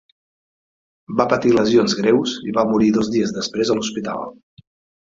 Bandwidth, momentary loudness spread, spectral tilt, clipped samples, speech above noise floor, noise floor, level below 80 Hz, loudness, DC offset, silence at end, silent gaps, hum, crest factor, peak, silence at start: 7.8 kHz; 10 LU; -5 dB/octave; under 0.1%; over 72 dB; under -90 dBFS; -54 dBFS; -18 LUFS; under 0.1%; 0.7 s; none; none; 18 dB; -2 dBFS; 1.1 s